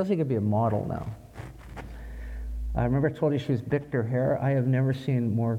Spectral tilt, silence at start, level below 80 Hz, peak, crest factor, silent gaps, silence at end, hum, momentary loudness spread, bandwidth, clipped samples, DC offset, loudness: -9.5 dB/octave; 0 s; -42 dBFS; -12 dBFS; 14 dB; none; 0 s; none; 17 LU; 8 kHz; under 0.1%; under 0.1%; -27 LUFS